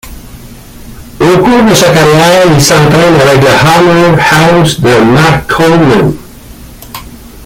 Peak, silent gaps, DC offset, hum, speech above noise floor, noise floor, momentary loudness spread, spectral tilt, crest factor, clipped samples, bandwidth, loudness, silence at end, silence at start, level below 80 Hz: 0 dBFS; none; under 0.1%; none; 24 dB; -29 dBFS; 7 LU; -5 dB/octave; 6 dB; 0.5%; 17 kHz; -5 LUFS; 0 s; 0.05 s; -30 dBFS